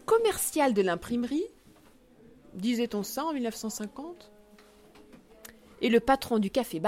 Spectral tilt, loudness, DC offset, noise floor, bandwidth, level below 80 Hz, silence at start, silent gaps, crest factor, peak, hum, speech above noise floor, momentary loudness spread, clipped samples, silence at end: -4 dB/octave; -29 LUFS; under 0.1%; -58 dBFS; 16.5 kHz; -58 dBFS; 0.1 s; none; 20 dB; -10 dBFS; none; 30 dB; 23 LU; under 0.1%; 0 s